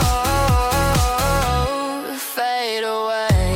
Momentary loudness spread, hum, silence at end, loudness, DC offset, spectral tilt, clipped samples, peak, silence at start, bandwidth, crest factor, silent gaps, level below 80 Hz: 6 LU; none; 0 s; -19 LUFS; under 0.1%; -4.5 dB/octave; under 0.1%; -6 dBFS; 0 s; 17 kHz; 12 dB; none; -26 dBFS